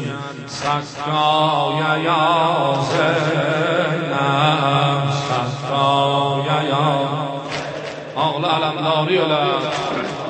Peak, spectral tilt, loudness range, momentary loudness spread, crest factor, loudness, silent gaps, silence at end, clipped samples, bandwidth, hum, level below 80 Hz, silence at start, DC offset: -2 dBFS; -5.5 dB/octave; 2 LU; 9 LU; 16 dB; -18 LUFS; none; 0 s; under 0.1%; 8.8 kHz; none; -58 dBFS; 0 s; under 0.1%